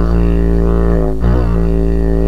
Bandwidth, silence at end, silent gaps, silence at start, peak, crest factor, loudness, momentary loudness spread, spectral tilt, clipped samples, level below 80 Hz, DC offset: 5 kHz; 0 s; none; 0 s; 0 dBFS; 10 dB; -14 LUFS; 1 LU; -10 dB/octave; under 0.1%; -14 dBFS; 10%